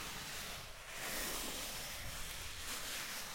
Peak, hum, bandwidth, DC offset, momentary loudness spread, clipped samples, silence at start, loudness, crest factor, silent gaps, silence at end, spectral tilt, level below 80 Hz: -28 dBFS; none; 16.5 kHz; under 0.1%; 5 LU; under 0.1%; 0 s; -43 LUFS; 16 dB; none; 0 s; -1 dB/octave; -56 dBFS